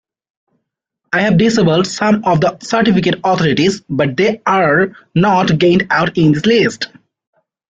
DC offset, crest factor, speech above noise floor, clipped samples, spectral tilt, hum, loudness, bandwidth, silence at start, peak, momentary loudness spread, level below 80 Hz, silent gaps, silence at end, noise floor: under 0.1%; 12 dB; 60 dB; under 0.1%; -6 dB/octave; none; -13 LUFS; 8 kHz; 1.1 s; -2 dBFS; 5 LU; -48 dBFS; none; 0.85 s; -73 dBFS